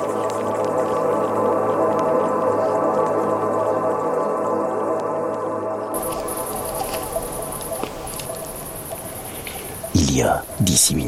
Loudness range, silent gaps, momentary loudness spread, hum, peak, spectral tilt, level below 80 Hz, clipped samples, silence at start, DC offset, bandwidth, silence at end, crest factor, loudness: 7 LU; none; 11 LU; none; -4 dBFS; -4 dB/octave; -44 dBFS; under 0.1%; 0 s; under 0.1%; 16.5 kHz; 0 s; 18 dB; -22 LUFS